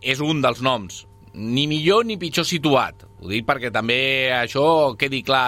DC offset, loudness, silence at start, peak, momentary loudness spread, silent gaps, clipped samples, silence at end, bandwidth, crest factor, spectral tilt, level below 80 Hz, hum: under 0.1%; -20 LUFS; 0 s; -2 dBFS; 10 LU; none; under 0.1%; 0 s; 16.5 kHz; 18 dB; -4.5 dB/octave; -52 dBFS; none